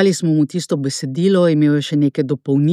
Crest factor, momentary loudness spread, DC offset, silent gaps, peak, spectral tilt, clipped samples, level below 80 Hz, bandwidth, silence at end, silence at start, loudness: 14 dB; 7 LU; under 0.1%; none; -2 dBFS; -6.5 dB/octave; under 0.1%; -72 dBFS; 13 kHz; 0 s; 0 s; -17 LUFS